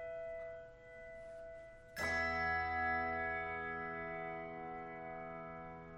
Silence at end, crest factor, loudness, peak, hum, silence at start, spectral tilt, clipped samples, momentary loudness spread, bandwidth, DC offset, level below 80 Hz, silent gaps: 0 s; 16 dB; -41 LUFS; -26 dBFS; none; 0 s; -5 dB/octave; under 0.1%; 16 LU; 11 kHz; under 0.1%; -62 dBFS; none